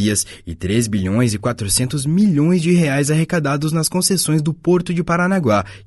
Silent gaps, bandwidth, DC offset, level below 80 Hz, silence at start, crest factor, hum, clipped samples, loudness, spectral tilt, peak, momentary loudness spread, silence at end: none; 12 kHz; under 0.1%; -44 dBFS; 0 s; 14 dB; none; under 0.1%; -17 LUFS; -5 dB/octave; -2 dBFS; 4 LU; 0.1 s